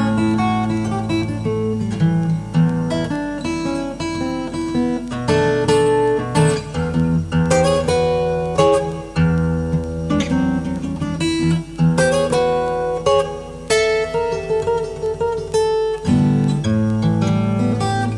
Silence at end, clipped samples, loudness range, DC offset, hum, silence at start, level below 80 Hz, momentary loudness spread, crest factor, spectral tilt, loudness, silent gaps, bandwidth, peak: 0 s; under 0.1%; 3 LU; under 0.1%; none; 0 s; -40 dBFS; 7 LU; 14 dB; -6.5 dB/octave; -18 LUFS; none; 12 kHz; -4 dBFS